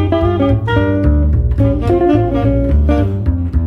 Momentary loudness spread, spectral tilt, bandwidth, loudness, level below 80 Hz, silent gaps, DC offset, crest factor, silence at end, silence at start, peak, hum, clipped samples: 2 LU; -10 dB/octave; 5.2 kHz; -14 LUFS; -18 dBFS; none; under 0.1%; 12 dB; 0 s; 0 s; 0 dBFS; none; under 0.1%